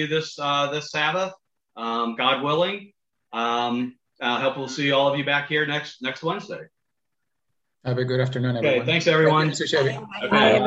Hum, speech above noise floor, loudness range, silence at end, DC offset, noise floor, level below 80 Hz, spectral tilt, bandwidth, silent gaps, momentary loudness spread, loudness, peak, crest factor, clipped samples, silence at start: none; 60 dB; 4 LU; 0 s; under 0.1%; -83 dBFS; -66 dBFS; -5 dB/octave; 8.2 kHz; none; 12 LU; -23 LUFS; -4 dBFS; 20 dB; under 0.1%; 0 s